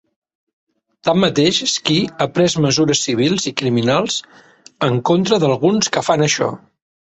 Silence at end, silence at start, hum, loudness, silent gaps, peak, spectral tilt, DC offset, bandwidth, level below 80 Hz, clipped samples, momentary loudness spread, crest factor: 0.6 s; 1.05 s; none; -16 LUFS; none; -2 dBFS; -4.5 dB/octave; under 0.1%; 8.4 kHz; -54 dBFS; under 0.1%; 6 LU; 16 dB